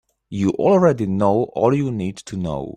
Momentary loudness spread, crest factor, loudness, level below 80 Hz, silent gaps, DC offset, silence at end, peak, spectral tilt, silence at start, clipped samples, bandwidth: 12 LU; 16 dB; -19 LUFS; -50 dBFS; none; under 0.1%; 0.05 s; -2 dBFS; -8 dB/octave; 0.3 s; under 0.1%; 10 kHz